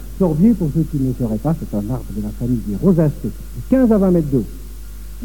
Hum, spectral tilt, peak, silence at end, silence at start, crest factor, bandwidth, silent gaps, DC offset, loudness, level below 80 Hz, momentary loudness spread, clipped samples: none; -9.5 dB/octave; -2 dBFS; 0 s; 0 s; 14 dB; 18 kHz; none; 2%; -18 LUFS; -30 dBFS; 17 LU; under 0.1%